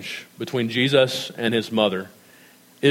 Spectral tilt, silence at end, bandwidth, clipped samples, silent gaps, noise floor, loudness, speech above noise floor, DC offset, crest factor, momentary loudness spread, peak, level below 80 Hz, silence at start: -5 dB/octave; 0 s; 16.5 kHz; under 0.1%; none; -51 dBFS; -22 LUFS; 29 dB; under 0.1%; 20 dB; 14 LU; -4 dBFS; -74 dBFS; 0 s